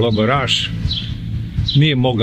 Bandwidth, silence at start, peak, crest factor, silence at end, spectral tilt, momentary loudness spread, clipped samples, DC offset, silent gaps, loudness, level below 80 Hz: 9.4 kHz; 0 s; -2 dBFS; 14 dB; 0 s; -6 dB/octave; 10 LU; under 0.1%; under 0.1%; none; -17 LUFS; -30 dBFS